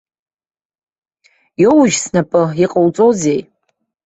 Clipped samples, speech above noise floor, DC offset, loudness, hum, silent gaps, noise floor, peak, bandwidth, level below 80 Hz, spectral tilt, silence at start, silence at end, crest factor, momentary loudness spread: under 0.1%; 56 dB; under 0.1%; -13 LUFS; none; none; -68 dBFS; -2 dBFS; 8.4 kHz; -56 dBFS; -5.5 dB/octave; 1.6 s; 0.65 s; 14 dB; 7 LU